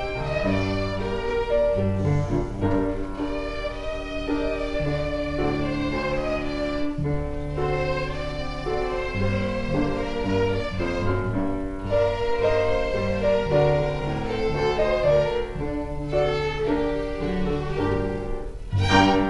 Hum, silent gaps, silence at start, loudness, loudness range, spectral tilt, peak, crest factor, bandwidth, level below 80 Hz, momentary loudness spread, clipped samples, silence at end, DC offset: none; none; 0 s; -25 LUFS; 4 LU; -7 dB/octave; -6 dBFS; 18 dB; 11.5 kHz; -34 dBFS; 8 LU; under 0.1%; 0 s; under 0.1%